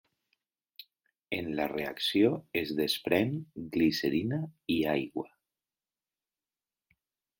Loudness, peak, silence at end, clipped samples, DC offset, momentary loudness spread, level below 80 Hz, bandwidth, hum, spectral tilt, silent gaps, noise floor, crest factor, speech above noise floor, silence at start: -31 LUFS; -12 dBFS; 2.15 s; under 0.1%; under 0.1%; 10 LU; -66 dBFS; 17 kHz; none; -5.5 dB/octave; none; under -90 dBFS; 22 dB; over 60 dB; 0.8 s